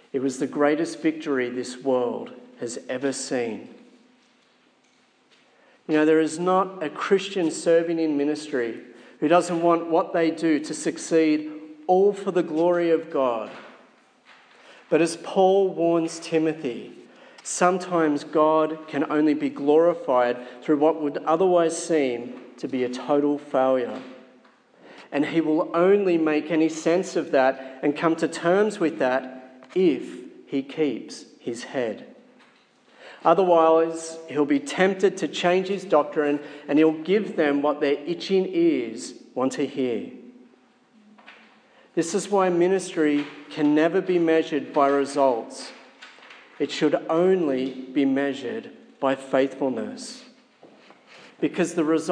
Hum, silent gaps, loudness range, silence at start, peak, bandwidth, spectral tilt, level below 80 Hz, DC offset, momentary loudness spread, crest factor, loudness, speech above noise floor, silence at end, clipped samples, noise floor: none; none; 6 LU; 0.15 s; -4 dBFS; 10.5 kHz; -5 dB/octave; -84 dBFS; under 0.1%; 13 LU; 20 dB; -23 LUFS; 39 dB; 0 s; under 0.1%; -62 dBFS